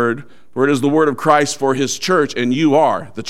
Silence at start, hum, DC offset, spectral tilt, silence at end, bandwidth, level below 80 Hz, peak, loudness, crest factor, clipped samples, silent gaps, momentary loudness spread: 0 s; none; 1%; -4.5 dB/octave; 0 s; 15.5 kHz; -60 dBFS; 0 dBFS; -15 LUFS; 16 dB; under 0.1%; none; 6 LU